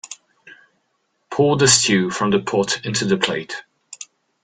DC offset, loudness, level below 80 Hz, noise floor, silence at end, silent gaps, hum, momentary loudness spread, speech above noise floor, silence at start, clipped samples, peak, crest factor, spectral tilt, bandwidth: under 0.1%; -18 LUFS; -56 dBFS; -69 dBFS; 0.4 s; none; none; 24 LU; 51 dB; 0.05 s; under 0.1%; 0 dBFS; 20 dB; -3 dB/octave; 10 kHz